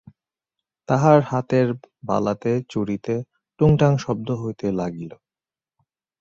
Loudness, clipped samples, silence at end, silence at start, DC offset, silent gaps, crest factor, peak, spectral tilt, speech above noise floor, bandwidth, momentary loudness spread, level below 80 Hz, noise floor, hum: -21 LUFS; under 0.1%; 1.05 s; 0.9 s; under 0.1%; none; 20 dB; -2 dBFS; -8 dB/octave; over 70 dB; 7.4 kHz; 13 LU; -50 dBFS; under -90 dBFS; none